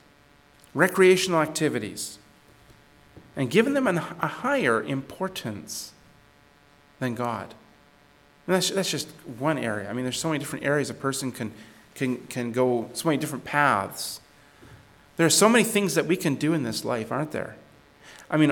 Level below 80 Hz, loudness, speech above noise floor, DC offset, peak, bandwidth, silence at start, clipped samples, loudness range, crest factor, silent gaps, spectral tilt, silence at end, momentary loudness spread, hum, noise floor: -64 dBFS; -25 LUFS; 32 dB; under 0.1%; -6 dBFS; 19 kHz; 0.75 s; under 0.1%; 7 LU; 20 dB; none; -4 dB/octave; 0 s; 16 LU; none; -57 dBFS